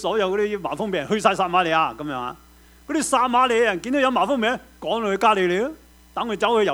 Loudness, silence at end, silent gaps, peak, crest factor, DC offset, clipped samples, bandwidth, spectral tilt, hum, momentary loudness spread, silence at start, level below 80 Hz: -21 LUFS; 0 s; none; -2 dBFS; 18 dB; under 0.1%; under 0.1%; over 20 kHz; -4 dB/octave; none; 11 LU; 0 s; -54 dBFS